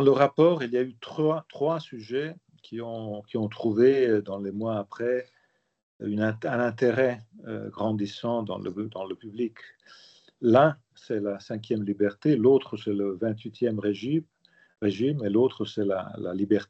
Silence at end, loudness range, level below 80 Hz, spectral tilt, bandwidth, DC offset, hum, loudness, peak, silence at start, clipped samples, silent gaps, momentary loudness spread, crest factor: 0.05 s; 4 LU; -76 dBFS; -8 dB/octave; 7.6 kHz; under 0.1%; none; -27 LUFS; -6 dBFS; 0 s; under 0.1%; 5.83-6.00 s; 14 LU; 20 dB